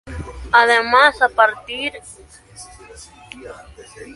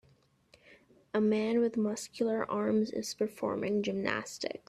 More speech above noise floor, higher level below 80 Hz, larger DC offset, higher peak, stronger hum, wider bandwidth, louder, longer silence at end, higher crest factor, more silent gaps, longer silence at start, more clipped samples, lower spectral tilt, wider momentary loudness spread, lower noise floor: second, 24 dB vs 35 dB; first, -42 dBFS vs -72 dBFS; neither; first, 0 dBFS vs -14 dBFS; neither; second, 11.5 kHz vs 14 kHz; first, -15 LUFS vs -32 LUFS; about the same, 0.05 s vs 0.1 s; about the same, 20 dB vs 20 dB; neither; second, 0.05 s vs 0.7 s; neither; second, -3 dB/octave vs -5 dB/octave; first, 25 LU vs 6 LU; second, -41 dBFS vs -67 dBFS